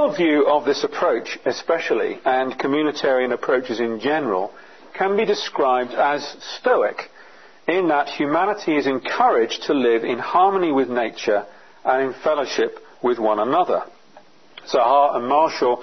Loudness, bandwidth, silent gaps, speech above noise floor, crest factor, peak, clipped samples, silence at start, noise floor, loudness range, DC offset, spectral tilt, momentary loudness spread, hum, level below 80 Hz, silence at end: -20 LUFS; 6.4 kHz; none; 31 dB; 16 dB; -4 dBFS; under 0.1%; 0 s; -50 dBFS; 3 LU; 0.3%; -4.5 dB/octave; 8 LU; none; -70 dBFS; 0 s